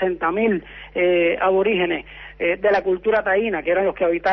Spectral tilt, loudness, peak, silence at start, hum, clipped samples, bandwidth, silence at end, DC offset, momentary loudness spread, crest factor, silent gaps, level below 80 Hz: -7.5 dB/octave; -20 LUFS; -8 dBFS; 0 s; none; under 0.1%; 6 kHz; 0 s; under 0.1%; 7 LU; 12 dB; none; -48 dBFS